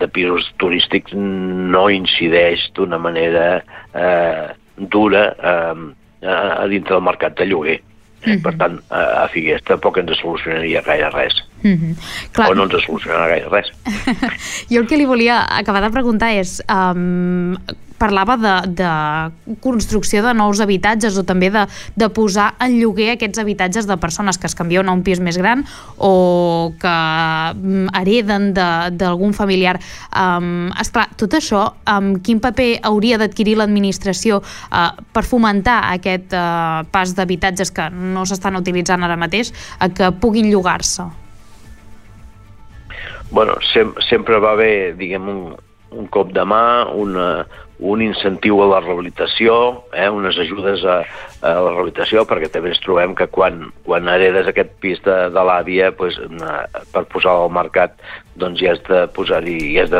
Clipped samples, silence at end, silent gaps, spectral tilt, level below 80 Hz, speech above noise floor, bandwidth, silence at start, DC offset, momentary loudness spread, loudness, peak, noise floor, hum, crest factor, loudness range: under 0.1%; 0 s; none; -4.5 dB/octave; -38 dBFS; 23 dB; 14 kHz; 0 s; under 0.1%; 9 LU; -16 LUFS; -2 dBFS; -39 dBFS; none; 14 dB; 2 LU